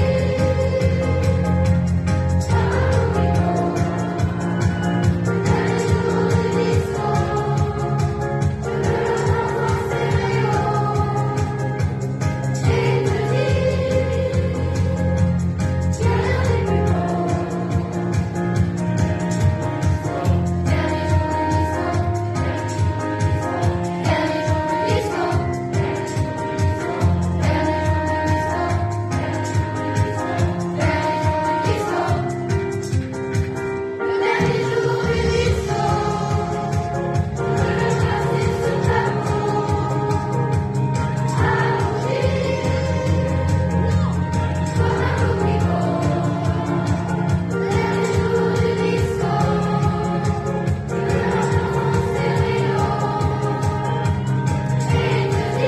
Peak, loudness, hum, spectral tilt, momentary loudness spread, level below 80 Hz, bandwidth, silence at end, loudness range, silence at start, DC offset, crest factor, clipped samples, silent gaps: -4 dBFS; -20 LUFS; none; -7 dB/octave; 4 LU; -34 dBFS; 12.5 kHz; 0 s; 2 LU; 0 s; under 0.1%; 14 dB; under 0.1%; none